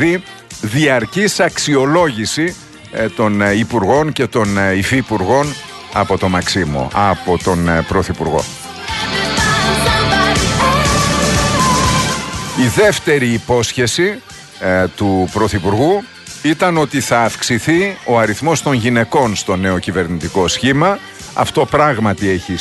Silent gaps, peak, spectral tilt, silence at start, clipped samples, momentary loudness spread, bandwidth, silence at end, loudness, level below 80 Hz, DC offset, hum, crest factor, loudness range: none; 0 dBFS; -4.5 dB/octave; 0 s; under 0.1%; 8 LU; 12.5 kHz; 0 s; -14 LUFS; -34 dBFS; under 0.1%; none; 14 dB; 3 LU